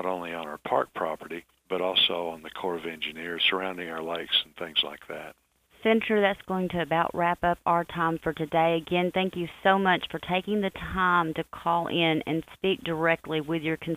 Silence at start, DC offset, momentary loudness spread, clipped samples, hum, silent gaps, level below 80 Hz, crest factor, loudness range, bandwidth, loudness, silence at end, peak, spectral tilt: 0 s; under 0.1%; 10 LU; under 0.1%; none; none; -56 dBFS; 20 dB; 3 LU; 15.5 kHz; -27 LUFS; 0 s; -8 dBFS; -6 dB/octave